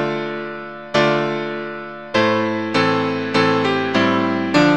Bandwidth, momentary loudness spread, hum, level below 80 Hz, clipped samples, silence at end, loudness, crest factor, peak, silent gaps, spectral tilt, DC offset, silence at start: 9.4 kHz; 11 LU; none; -56 dBFS; under 0.1%; 0 s; -18 LUFS; 18 dB; 0 dBFS; none; -5.5 dB/octave; 0.4%; 0 s